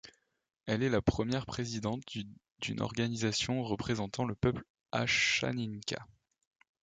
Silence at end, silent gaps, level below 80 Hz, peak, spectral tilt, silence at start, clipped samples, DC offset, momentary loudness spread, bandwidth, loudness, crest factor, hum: 0.8 s; 2.51-2.55 s, 4.70-4.75 s; -54 dBFS; -14 dBFS; -4.5 dB/octave; 0.05 s; under 0.1%; under 0.1%; 13 LU; 9.4 kHz; -34 LUFS; 22 dB; none